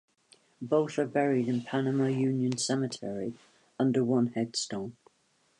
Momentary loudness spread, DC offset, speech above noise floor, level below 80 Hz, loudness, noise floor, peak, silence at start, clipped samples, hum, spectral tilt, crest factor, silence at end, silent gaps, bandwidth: 10 LU; under 0.1%; 41 dB; -74 dBFS; -30 LUFS; -70 dBFS; -14 dBFS; 0.6 s; under 0.1%; none; -5.5 dB/octave; 16 dB; 0.7 s; none; 11 kHz